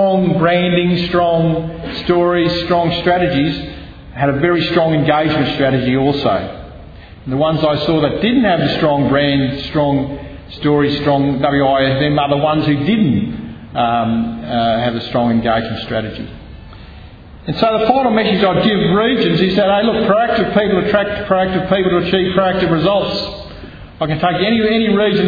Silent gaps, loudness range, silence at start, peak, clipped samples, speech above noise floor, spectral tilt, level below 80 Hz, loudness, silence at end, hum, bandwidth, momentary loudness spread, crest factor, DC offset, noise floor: none; 4 LU; 0 s; 0 dBFS; under 0.1%; 22 dB; -8.5 dB/octave; -38 dBFS; -15 LUFS; 0 s; none; 5 kHz; 11 LU; 14 dB; under 0.1%; -36 dBFS